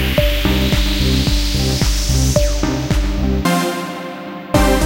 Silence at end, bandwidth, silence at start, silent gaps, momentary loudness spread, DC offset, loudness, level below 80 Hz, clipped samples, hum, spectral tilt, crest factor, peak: 0 s; 16 kHz; 0 s; none; 7 LU; under 0.1%; -17 LUFS; -20 dBFS; under 0.1%; none; -4.5 dB/octave; 16 dB; 0 dBFS